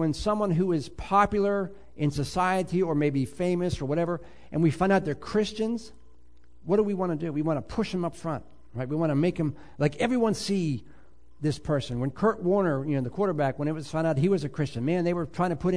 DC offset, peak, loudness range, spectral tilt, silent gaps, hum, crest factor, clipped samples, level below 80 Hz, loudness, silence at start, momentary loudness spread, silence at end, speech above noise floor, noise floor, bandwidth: 0.5%; -8 dBFS; 3 LU; -7 dB/octave; none; none; 18 dB; under 0.1%; -50 dBFS; -27 LUFS; 0 s; 7 LU; 0 s; 32 dB; -58 dBFS; 11 kHz